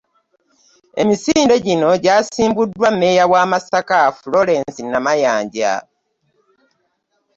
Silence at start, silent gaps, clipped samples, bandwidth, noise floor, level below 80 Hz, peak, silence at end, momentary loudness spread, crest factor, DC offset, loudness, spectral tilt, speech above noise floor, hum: 0.95 s; none; under 0.1%; 8 kHz; -67 dBFS; -54 dBFS; -2 dBFS; 1.55 s; 7 LU; 14 dB; under 0.1%; -15 LUFS; -4.5 dB/octave; 52 dB; none